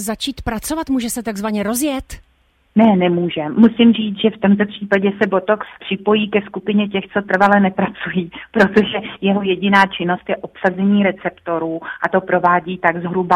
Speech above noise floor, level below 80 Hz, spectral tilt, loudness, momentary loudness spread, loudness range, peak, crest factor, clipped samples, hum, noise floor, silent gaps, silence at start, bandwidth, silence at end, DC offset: 42 dB; -46 dBFS; -5.5 dB/octave; -17 LUFS; 9 LU; 3 LU; 0 dBFS; 16 dB; under 0.1%; none; -58 dBFS; none; 0 s; 16 kHz; 0 s; under 0.1%